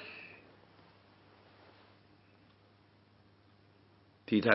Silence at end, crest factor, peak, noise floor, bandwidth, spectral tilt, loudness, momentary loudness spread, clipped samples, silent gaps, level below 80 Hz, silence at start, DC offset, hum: 0 s; 30 dB; -8 dBFS; -65 dBFS; 5.6 kHz; -4 dB/octave; -37 LUFS; 17 LU; under 0.1%; none; -78 dBFS; 0 s; under 0.1%; none